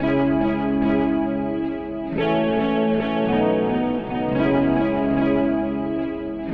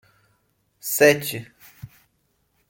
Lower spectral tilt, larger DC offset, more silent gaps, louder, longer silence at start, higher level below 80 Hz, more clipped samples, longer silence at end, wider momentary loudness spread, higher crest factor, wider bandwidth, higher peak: first, -9.5 dB/octave vs -3.5 dB/octave; neither; neither; about the same, -21 LUFS vs -20 LUFS; second, 0 s vs 0.85 s; first, -42 dBFS vs -64 dBFS; neither; second, 0 s vs 0.85 s; second, 6 LU vs 27 LU; second, 12 dB vs 24 dB; second, 4.9 kHz vs 17 kHz; second, -10 dBFS vs -2 dBFS